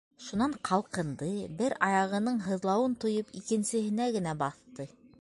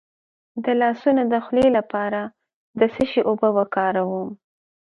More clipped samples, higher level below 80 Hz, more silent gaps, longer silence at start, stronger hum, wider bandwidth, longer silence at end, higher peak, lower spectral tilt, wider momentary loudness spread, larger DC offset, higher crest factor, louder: neither; second, -66 dBFS vs -56 dBFS; second, none vs 2.54-2.74 s; second, 0.2 s vs 0.55 s; neither; about the same, 11.5 kHz vs 10.5 kHz; second, 0.15 s vs 0.6 s; second, -10 dBFS vs -4 dBFS; second, -5.5 dB/octave vs -7.5 dB/octave; second, 8 LU vs 12 LU; neither; about the same, 20 dB vs 18 dB; second, -31 LUFS vs -21 LUFS